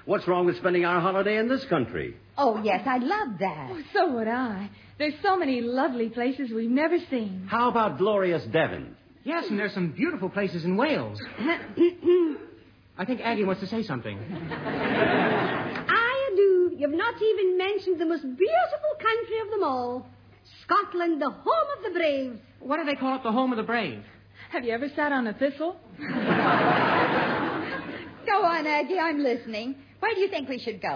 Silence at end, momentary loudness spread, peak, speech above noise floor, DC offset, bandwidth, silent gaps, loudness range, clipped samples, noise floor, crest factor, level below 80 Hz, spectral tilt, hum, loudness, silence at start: 0 s; 11 LU; -10 dBFS; 26 dB; under 0.1%; 5.4 kHz; none; 4 LU; under 0.1%; -52 dBFS; 16 dB; -64 dBFS; -7.5 dB/octave; none; -26 LUFS; 0.05 s